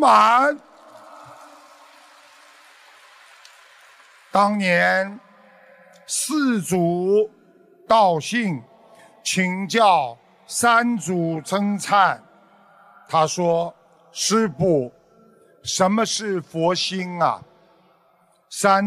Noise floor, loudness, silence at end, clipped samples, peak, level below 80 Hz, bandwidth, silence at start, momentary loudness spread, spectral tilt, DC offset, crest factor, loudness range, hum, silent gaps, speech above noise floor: -60 dBFS; -20 LUFS; 0 s; under 0.1%; -4 dBFS; -66 dBFS; 15.5 kHz; 0 s; 12 LU; -4 dB/octave; under 0.1%; 18 dB; 3 LU; none; none; 40 dB